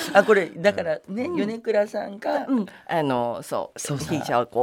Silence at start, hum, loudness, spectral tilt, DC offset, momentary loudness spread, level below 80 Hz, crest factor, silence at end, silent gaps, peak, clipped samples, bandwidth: 0 s; none; -24 LUFS; -5 dB/octave; under 0.1%; 10 LU; -64 dBFS; 22 dB; 0 s; none; -2 dBFS; under 0.1%; 17 kHz